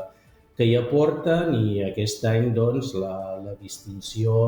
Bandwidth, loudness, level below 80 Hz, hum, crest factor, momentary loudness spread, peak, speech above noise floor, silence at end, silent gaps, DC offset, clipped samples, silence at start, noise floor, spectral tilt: over 20 kHz; -23 LUFS; -54 dBFS; none; 14 dB; 15 LU; -8 dBFS; 31 dB; 0 s; none; under 0.1%; under 0.1%; 0 s; -54 dBFS; -6.5 dB/octave